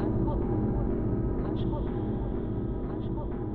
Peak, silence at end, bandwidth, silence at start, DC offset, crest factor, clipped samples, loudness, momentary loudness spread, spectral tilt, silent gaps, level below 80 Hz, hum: -18 dBFS; 0 s; 4.2 kHz; 0 s; under 0.1%; 12 dB; under 0.1%; -31 LUFS; 5 LU; -12 dB/octave; none; -36 dBFS; none